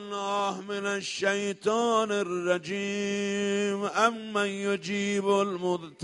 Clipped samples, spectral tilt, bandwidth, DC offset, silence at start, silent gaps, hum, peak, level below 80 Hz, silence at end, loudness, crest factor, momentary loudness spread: under 0.1%; -4 dB/octave; 11.5 kHz; under 0.1%; 0 s; none; none; -8 dBFS; -72 dBFS; 0 s; -28 LUFS; 20 dB; 5 LU